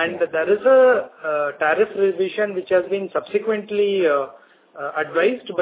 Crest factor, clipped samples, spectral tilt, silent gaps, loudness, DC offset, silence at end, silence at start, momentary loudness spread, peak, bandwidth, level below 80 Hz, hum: 14 dB; under 0.1%; -9 dB/octave; none; -20 LUFS; under 0.1%; 0 s; 0 s; 10 LU; -4 dBFS; 4 kHz; -68 dBFS; none